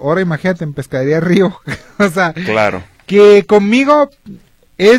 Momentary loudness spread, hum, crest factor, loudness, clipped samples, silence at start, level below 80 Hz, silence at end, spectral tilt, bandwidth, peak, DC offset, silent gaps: 13 LU; none; 12 dB; -12 LUFS; under 0.1%; 0 s; -48 dBFS; 0 s; -6.5 dB/octave; 13.5 kHz; 0 dBFS; under 0.1%; none